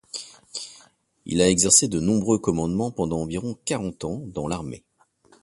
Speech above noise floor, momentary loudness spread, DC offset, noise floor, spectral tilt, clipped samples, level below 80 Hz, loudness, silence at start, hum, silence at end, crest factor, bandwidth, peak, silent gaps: 36 dB; 20 LU; under 0.1%; -59 dBFS; -4 dB/octave; under 0.1%; -48 dBFS; -22 LUFS; 0.15 s; none; 0.65 s; 22 dB; 11.5 kHz; -2 dBFS; none